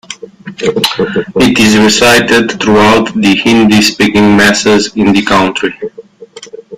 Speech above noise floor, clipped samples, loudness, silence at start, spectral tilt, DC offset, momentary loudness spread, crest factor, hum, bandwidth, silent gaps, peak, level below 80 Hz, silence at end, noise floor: 25 dB; 0.2%; -8 LUFS; 0.1 s; -4 dB/octave; under 0.1%; 12 LU; 8 dB; none; 16 kHz; none; 0 dBFS; -38 dBFS; 0 s; -32 dBFS